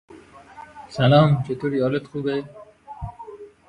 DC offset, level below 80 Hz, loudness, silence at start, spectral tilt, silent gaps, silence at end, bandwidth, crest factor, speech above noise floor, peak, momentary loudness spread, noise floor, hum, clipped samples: under 0.1%; -50 dBFS; -21 LUFS; 0.15 s; -8 dB/octave; none; 0.2 s; 9.6 kHz; 20 dB; 26 dB; -4 dBFS; 26 LU; -46 dBFS; none; under 0.1%